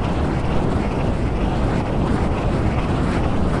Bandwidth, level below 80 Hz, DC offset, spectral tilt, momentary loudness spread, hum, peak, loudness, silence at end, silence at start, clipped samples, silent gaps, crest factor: 11 kHz; -26 dBFS; under 0.1%; -7.5 dB/octave; 1 LU; none; -6 dBFS; -21 LUFS; 0 s; 0 s; under 0.1%; none; 12 dB